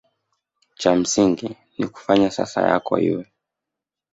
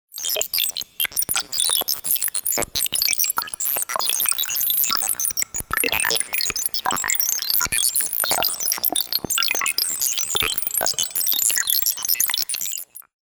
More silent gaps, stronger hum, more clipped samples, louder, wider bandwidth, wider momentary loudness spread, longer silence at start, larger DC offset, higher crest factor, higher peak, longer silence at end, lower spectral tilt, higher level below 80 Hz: neither; neither; neither; about the same, -20 LUFS vs -19 LUFS; second, 8 kHz vs over 20 kHz; first, 11 LU vs 5 LU; first, 0.8 s vs 0.15 s; neither; about the same, 20 dB vs 22 dB; about the same, -2 dBFS vs -2 dBFS; first, 0.9 s vs 0.25 s; first, -4.5 dB/octave vs 1 dB/octave; about the same, -56 dBFS vs -52 dBFS